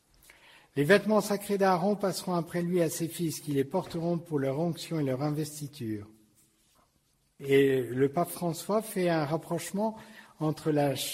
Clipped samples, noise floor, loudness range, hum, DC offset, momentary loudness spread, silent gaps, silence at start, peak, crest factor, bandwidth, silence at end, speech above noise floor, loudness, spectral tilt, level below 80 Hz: under 0.1%; -71 dBFS; 5 LU; none; under 0.1%; 10 LU; none; 0.75 s; -8 dBFS; 22 dB; 16 kHz; 0 s; 42 dB; -29 LUFS; -5.5 dB/octave; -68 dBFS